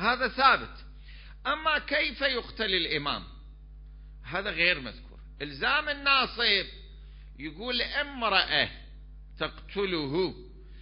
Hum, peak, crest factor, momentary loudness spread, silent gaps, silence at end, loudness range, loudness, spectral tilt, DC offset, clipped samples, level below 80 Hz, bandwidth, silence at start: none; -8 dBFS; 22 dB; 19 LU; none; 0 s; 3 LU; -27 LUFS; -7.5 dB/octave; under 0.1%; under 0.1%; -48 dBFS; 5.4 kHz; 0 s